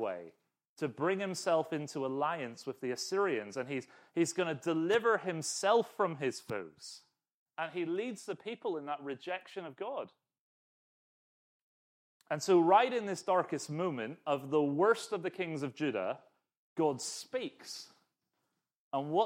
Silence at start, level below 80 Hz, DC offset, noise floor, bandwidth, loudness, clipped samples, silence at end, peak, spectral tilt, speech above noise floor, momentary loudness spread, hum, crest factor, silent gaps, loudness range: 0 s; -86 dBFS; under 0.1%; -84 dBFS; 16 kHz; -34 LUFS; under 0.1%; 0 s; -14 dBFS; -4.5 dB/octave; 50 dB; 13 LU; none; 22 dB; 0.69-0.76 s, 7.34-7.46 s, 10.39-12.20 s, 16.57-16.76 s, 18.76-18.91 s; 9 LU